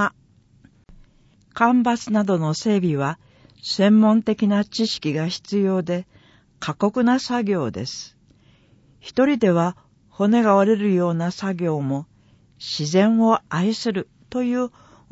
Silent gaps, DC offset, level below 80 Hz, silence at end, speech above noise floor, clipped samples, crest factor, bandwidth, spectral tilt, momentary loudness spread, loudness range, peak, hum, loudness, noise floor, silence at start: none; under 0.1%; -60 dBFS; 0.45 s; 36 dB; under 0.1%; 18 dB; 8 kHz; -6 dB/octave; 13 LU; 4 LU; -4 dBFS; none; -21 LUFS; -56 dBFS; 0 s